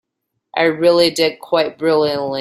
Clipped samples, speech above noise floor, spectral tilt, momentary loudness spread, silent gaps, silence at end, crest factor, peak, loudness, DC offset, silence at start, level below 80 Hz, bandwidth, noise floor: under 0.1%; 60 dB; -4.5 dB/octave; 6 LU; none; 0 s; 16 dB; -2 dBFS; -16 LUFS; under 0.1%; 0.55 s; -60 dBFS; 15.5 kHz; -75 dBFS